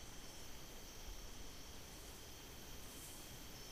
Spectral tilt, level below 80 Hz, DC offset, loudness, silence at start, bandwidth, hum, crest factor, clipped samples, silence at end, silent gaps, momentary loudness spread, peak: -2.5 dB/octave; -58 dBFS; under 0.1%; -54 LUFS; 0 s; 15.5 kHz; none; 14 dB; under 0.1%; 0 s; none; 2 LU; -40 dBFS